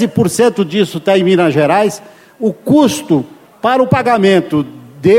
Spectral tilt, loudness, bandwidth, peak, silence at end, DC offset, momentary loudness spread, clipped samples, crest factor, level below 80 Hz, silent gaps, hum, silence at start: -6 dB/octave; -12 LUFS; 16.5 kHz; 0 dBFS; 0 s; under 0.1%; 8 LU; under 0.1%; 12 dB; -50 dBFS; none; none; 0 s